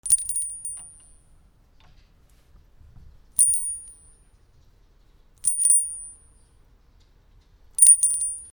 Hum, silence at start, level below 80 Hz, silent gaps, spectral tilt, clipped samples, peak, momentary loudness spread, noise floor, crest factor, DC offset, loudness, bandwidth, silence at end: none; 0.05 s; -56 dBFS; none; 1.5 dB/octave; under 0.1%; 0 dBFS; 22 LU; -56 dBFS; 26 dB; under 0.1%; -18 LUFS; over 20 kHz; 0.05 s